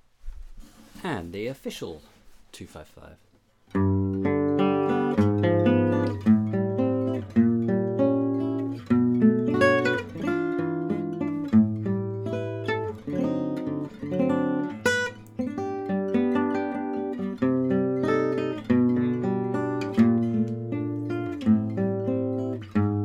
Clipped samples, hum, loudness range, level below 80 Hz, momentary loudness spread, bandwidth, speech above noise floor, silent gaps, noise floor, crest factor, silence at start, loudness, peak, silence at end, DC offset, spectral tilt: under 0.1%; none; 5 LU; -54 dBFS; 10 LU; 12 kHz; 10 dB; none; -45 dBFS; 18 dB; 0.25 s; -25 LUFS; -8 dBFS; 0 s; under 0.1%; -7.5 dB/octave